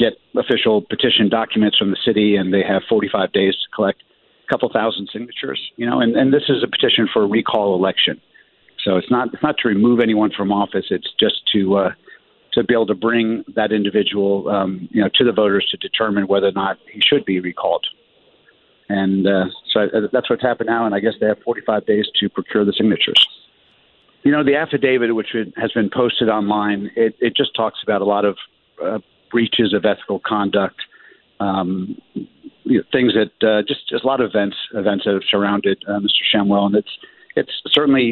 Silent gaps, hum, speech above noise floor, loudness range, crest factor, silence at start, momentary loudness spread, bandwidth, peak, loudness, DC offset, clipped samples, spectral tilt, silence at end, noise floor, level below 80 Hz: none; none; 38 dB; 3 LU; 16 dB; 0 s; 9 LU; 5.4 kHz; -2 dBFS; -17 LUFS; under 0.1%; under 0.1%; -7.5 dB/octave; 0 s; -55 dBFS; -58 dBFS